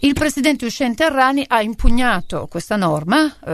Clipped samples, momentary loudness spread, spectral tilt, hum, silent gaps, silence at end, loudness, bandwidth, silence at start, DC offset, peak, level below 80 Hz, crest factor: under 0.1%; 7 LU; -4.5 dB/octave; none; none; 0 s; -17 LUFS; 13.5 kHz; 0 s; under 0.1%; 0 dBFS; -26 dBFS; 16 dB